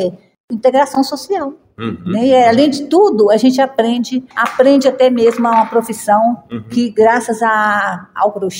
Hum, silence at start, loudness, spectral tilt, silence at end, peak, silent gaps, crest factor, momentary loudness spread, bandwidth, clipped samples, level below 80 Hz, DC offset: none; 0 s; -13 LUFS; -5 dB/octave; 0 s; 0 dBFS; 0.40-0.48 s; 12 dB; 10 LU; 16.5 kHz; under 0.1%; -58 dBFS; under 0.1%